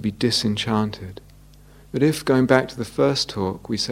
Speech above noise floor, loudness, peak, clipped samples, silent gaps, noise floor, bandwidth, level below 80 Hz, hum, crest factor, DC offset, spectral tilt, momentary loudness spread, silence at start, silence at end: 26 dB; -21 LUFS; 0 dBFS; under 0.1%; none; -48 dBFS; 16.5 kHz; -50 dBFS; none; 22 dB; under 0.1%; -5 dB/octave; 10 LU; 0 s; 0 s